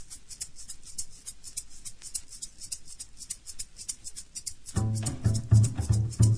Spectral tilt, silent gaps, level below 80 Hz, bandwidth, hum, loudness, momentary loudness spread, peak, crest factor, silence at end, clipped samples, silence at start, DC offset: -5 dB/octave; none; -44 dBFS; 11 kHz; none; -32 LUFS; 18 LU; -10 dBFS; 20 dB; 0 s; under 0.1%; 0 s; under 0.1%